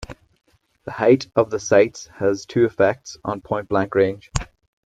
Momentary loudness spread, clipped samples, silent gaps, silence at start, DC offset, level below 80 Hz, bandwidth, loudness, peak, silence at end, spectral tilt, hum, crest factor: 13 LU; under 0.1%; none; 0 s; under 0.1%; -44 dBFS; 9.2 kHz; -20 LUFS; -2 dBFS; 0.4 s; -5.5 dB/octave; none; 20 dB